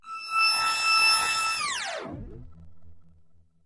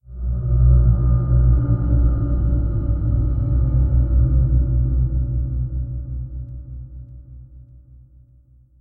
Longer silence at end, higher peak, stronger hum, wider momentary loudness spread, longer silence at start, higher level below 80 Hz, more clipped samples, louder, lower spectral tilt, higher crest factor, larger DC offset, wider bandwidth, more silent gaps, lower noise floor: second, 0.45 s vs 1.2 s; second, -10 dBFS vs -4 dBFS; neither; about the same, 17 LU vs 17 LU; about the same, 0.05 s vs 0.1 s; second, -54 dBFS vs -20 dBFS; neither; second, -23 LUFS vs -20 LUFS; second, 0 dB/octave vs -14.5 dB/octave; about the same, 18 dB vs 14 dB; neither; first, 11.5 kHz vs 1.6 kHz; neither; first, -59 dBFS vs -51 dBFS